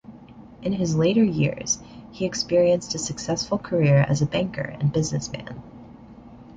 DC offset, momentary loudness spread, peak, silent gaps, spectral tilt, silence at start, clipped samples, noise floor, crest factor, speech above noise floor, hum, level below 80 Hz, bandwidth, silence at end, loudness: under 0.1%; 12 LU; -8 dBFS; none; -5.5 dB/octave; 0.1 s; under 0.1%; -45 dBFS; 16 dB; 22 dB; none; -50 dBFS; 9.2 kHz; 0.05 s; -23 LUFS